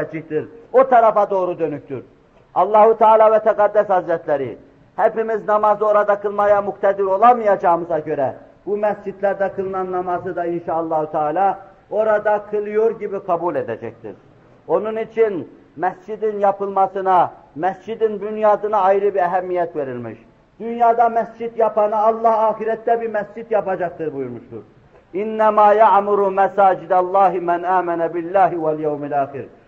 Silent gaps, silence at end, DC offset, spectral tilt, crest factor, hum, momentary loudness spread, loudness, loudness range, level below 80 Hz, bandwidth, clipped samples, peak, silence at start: none; 0.2 s; under 0.1%; -8 dB/octave; 16 dB; none; 13 LU; -18 LUFS; 6 LU; -60 dBFS; 6.6 kHz; under 0.1%; -2 dBFS; 0 s